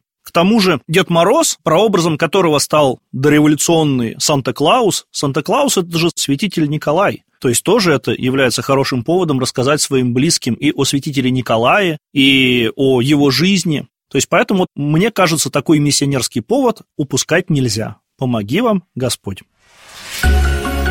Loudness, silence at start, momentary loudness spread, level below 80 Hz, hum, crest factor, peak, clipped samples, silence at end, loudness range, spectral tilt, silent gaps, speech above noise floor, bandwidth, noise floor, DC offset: -14 LUFS; 0.25 s; 7 LU; -30 dBFS; none; 14 dB; 0 dBFS; under 0.1%; 0 s; 4 LU; -4.5 dB/octave; none; 27 dB; 16.5 kHz; -41 dBFS; 0.1%